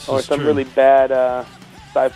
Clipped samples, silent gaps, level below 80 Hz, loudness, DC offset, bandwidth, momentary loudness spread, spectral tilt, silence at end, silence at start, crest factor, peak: under 0.1%; none; -50 dBFS; -16 LUFS; under 0.1%; 12 kHz; 12 LU; -5.5 dB/octave; 0.05 s; 0 s; 14 dB; -2 dBFS